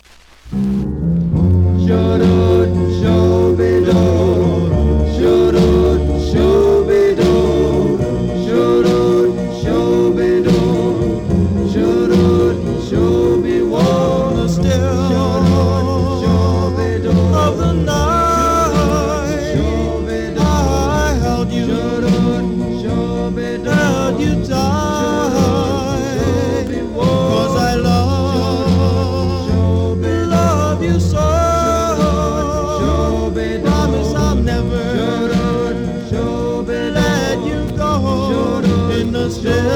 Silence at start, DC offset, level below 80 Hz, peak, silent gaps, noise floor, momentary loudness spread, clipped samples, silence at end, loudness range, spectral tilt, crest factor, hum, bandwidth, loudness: 0.45 s; under 0.1%; -26 dBFS; -2 dBFS; none; -40 dBFS; 6 LU; under 0.1%; 0 s; 4 LU; -7 dB/octave; 12 dB; none; 16.5 kHz; -15 LUFS